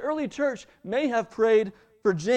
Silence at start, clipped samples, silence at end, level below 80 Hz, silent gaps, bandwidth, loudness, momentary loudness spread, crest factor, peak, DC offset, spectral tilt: 0 s; under 0.1%; 0 s; -64 dBFS; none; 9 kHz; -26 LUFS; 9 LU; 14 dB; -12 dBFS; under 0.1%; -5.5 dB/octave